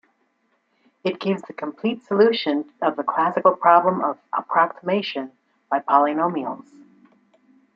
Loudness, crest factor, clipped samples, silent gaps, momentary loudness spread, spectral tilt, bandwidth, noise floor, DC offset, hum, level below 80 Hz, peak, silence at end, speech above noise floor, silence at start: -21 LUFS; 20 dB; under 0.1%; none; 12 LU; -7.5 dB/octave; 7.6 kHz; -68 dBFS; under 0.1%; none; -72 dBFS; -2 dBFS; 1.15 s; 47 dB; 1.05 s